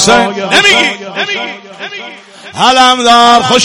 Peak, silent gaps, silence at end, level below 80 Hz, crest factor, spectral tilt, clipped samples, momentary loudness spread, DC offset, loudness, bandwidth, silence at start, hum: 0 dBFS; none; 0 s; -44 dBFS; 10 dB; -2 dB/octave; 1%; 19 LU; under 0.1%; -7 LUFS; 18 kHz; 0 s; none